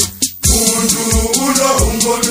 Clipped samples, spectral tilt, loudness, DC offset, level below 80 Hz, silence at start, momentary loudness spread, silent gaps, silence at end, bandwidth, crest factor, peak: under 0.1%; -3 dB/octave; -12 LUFS; under 0.1%; -22 dBFS; 0 s; 3 LU; none; 0 s; 16.5 kHz; 14 dB; 0 dBFS